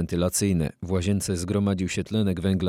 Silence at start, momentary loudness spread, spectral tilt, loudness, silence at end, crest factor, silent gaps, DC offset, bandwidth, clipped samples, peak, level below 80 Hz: 0 s; 4 LU; -5.5 dB/octave; -25 LUFS; 0 s; 14 dB; none; under 0.1%; 16 kHz; under 0.1%; -10 dBFS; -48 dBFS